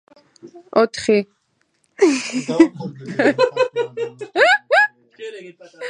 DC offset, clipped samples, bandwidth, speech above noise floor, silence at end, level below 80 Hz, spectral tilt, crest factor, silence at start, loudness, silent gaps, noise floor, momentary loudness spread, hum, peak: under 0.1%; under 0.1%; 11 kHz; 47 dB; 0 s; -66 dBFS; -4 dB/octave; 20 dB; 0.45 s; -18 LUFS; none; -66 dBFS; 19 LU; none; 0 dBFS